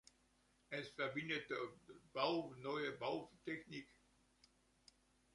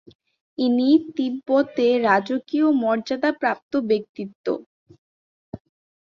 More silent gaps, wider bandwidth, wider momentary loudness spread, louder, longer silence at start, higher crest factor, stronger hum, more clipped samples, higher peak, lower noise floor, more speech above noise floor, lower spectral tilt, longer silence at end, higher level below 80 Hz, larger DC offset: second, none vs 3.63-3.71 s, 4.09-4.14 s, 4.35-4.44 s, 4.66-4.86 s, 4.98-5.52 s; first, 11.5 kHz vs 7 kHz; second, 12 LU vs 18 LU; second, -45 LUFS vs -22 LUFS; about the same, 0.7 s vs 0.6 s; first, 24 dB vs 18 dB; neither; neither; second, -24 dBFS vs -4 dBFS; second, -77 dBFS vs under -90 dBFS; second, 31 dB vs over 69 dB; about the same, -5 dB/octave vs -6 dB/octave; first, 1.5 s vs 0.45 s; second, -80 dBFS vs -66 dBFS; neither